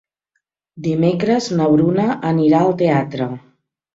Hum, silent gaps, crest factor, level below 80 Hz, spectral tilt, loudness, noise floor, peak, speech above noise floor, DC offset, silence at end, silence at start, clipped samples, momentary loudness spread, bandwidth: none; none; 14 dB; -56 dBFS; -7.5 dB/octave; -17 LUFS; -73 dBFS; -2 dBFS; 57 dB; under 0.1%; 0.55 s; 0.75 s; under 0.1%; 11 LU; 7.8 kHz